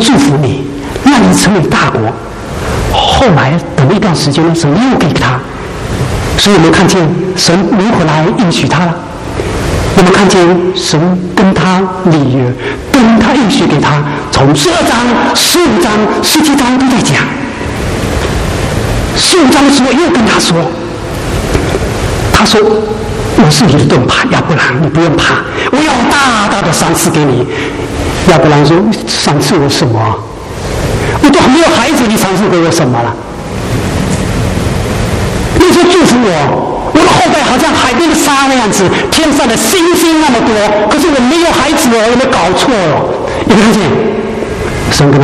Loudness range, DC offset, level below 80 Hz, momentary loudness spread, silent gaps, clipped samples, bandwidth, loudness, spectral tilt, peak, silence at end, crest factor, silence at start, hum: 2 LU; under 0.1%; -26 dBFS; 9 LU; none; 0.5%; 15.5 kHz; -8 LUFS; -4.5 dB/octave; 0 dBFS; 0 s; 8 dB; 0 s; none